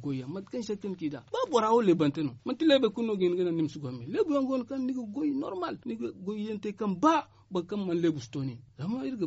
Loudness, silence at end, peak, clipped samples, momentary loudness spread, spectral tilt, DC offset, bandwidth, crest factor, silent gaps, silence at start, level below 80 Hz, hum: -30 LUFS; 0 s; -10 dBFS; under 0.1%; 12 LU; -5.5 dB/octave; under 0.1%; 8 kHz; 18 dB; none; 0 s; -70 dBFS; none